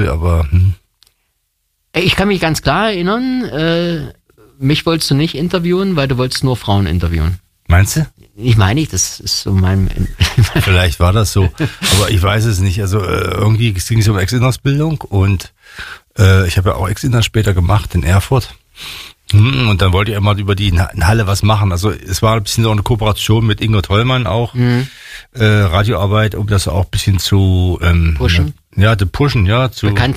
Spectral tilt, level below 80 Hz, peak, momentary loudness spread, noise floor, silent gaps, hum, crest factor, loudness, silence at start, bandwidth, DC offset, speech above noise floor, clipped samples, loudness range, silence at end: -5.5 dB/octave; -26 dBFS; 0 dBFS; 6 LU; -66 dBFS; none; none; 12 dB; -13 LUFS; 0 s; 15.5 kHz; under 0.1%; 53 dB; under 0.1%; 2 LU; 0 s